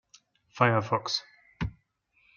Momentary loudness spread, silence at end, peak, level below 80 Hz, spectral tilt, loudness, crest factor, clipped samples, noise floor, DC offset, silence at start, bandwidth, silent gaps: 13 LU; 0.65 s; -4 dBFS; -52 dBFS; -5 dB/octave; -29 LUFS; 26 dB; under 0.1%; -69 dBFS; under 0.1%; 0.55 s; 7.2 kHz; none